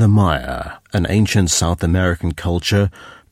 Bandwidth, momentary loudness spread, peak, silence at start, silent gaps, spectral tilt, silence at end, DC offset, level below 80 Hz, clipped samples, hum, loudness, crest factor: 15.5 kHz; 8 LU; -2 dBFS; 0 s; none; -5 dB/octave; 0.2 s; under 0.1%; -32 dBFS; under 0.1%; none; -17 LUFS; 14 dB